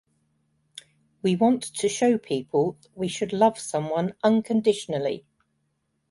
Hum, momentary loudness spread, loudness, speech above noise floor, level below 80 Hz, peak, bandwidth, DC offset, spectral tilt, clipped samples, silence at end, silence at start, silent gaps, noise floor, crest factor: none; 8 LU; -25 LUFS; 50 dB; -68 dBFS; -6 dBFS; 11.5 kHz; under 0.1%; -5.5 dB/octave; under 0.1%; 0.9 s; 1.25 s; none; -74 dBFS; 20 dB